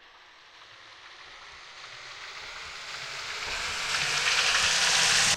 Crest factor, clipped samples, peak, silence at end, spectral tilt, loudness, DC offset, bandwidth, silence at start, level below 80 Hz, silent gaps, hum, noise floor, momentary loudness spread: 20 dB; under 0.1%; -10 dBFS; 0 s; 1 dB/octave; -25 LUFS; under 0.1%; 16 kHz; 0.15 s; -58 dBFS; none; none; -53 dBFS; 24 LU